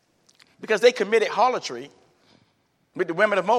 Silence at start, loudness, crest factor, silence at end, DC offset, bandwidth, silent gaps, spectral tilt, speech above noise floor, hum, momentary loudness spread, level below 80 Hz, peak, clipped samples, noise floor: 0.6 s; -22 LUFS; 20 dB; 0 s; under 0.1%; 12.5 kHz; none; -3.5 dB/octave; 46 dB; none; 19 LU; -82 dBFS; -4 dBFS; under 0.1%; -67 dBFS